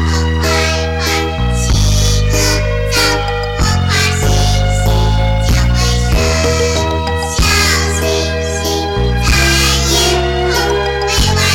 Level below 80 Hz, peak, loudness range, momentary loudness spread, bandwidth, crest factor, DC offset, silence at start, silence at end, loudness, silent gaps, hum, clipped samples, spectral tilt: -18 dBFS; -2 dBFS; 1 LU; 5 LU; 17 kHz; 10 dB; under 0.1%; 0 s; 0 s; -13 LUFS; none; none; under 0.1%; -4 dB/octave